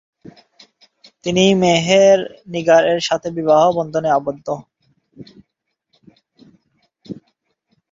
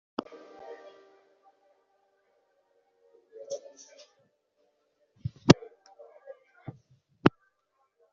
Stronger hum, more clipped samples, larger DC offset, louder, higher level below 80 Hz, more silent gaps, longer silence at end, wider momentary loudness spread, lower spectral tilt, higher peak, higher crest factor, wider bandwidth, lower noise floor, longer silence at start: neither; neither; neither; first, -16 LUFS vs -28 LUFS; about the same, -58 dBFS vs -60 dBFS; neither; about the same, 0.8 s vs 0.85 s; second, 17 LU vs 29 LU; about the same, -4.5 dB/octave vs -5.5 dB/octave; about the same, -2 dBFS vs -2 dBFS; second, 16 dB vs 32 dB; about the same, 7.8 kHz vs 7.4 kHz; second, -67 dBFS vs -75 dBFS; first, 1.25 s vs 0.7 s